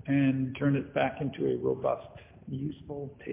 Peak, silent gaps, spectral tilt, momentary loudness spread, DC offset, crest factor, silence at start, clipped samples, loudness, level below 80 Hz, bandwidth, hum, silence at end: -14 dBFS; none; -7 dB/octave; 13 LU; under 0.1%; 16 dB; 0.05 s; under 0.1%; -31 LUFS; -58 dBFS; 3.7 kHz; none; 0 s